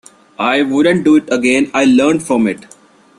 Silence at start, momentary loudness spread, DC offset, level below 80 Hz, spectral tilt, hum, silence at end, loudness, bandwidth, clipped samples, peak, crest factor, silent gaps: 0.4 s; 7 LU; under 0.1%; -54 dBFS; -5 dB/octave; none; 0.55 s; -13 LUFS; 12 kHz; under 0.1%; -2 dBFS; 12 dB; none